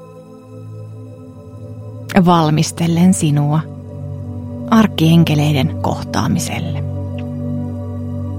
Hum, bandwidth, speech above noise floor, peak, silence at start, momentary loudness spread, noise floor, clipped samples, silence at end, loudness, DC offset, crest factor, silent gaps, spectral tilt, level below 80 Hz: none; 16 kHz; 24 dB; 0 dBFS; 0 s; 22 LU; -37 dBFS; under 0.1%; 0 s; -16 LUFS; under 0.1%; 16 dB; none; -6 dB/octave; -50 dBFS